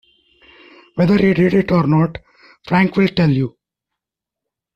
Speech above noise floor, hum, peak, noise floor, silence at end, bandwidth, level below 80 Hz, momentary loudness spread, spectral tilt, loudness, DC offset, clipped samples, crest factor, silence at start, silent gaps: 70 dB; none; -4 dBFS; -84 dBFS; 1.25 s; 6.4 kHz; -46 dBFS; 10 LU; -9 dB/octave; -16 LUFS; under 0.1%; under 0.1%; 14 dB; 0.95 s; none